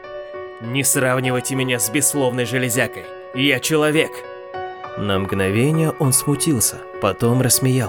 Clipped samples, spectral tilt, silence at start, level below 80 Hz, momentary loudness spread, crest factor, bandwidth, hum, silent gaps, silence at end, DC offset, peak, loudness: under 0.1%; -4 dB/octave; 0 s; -54 dBFS; 14 LU; 20 dB; over 20 kHz; none; none; 0 s; under 0.1%; 0 dBFS; -18 LUFS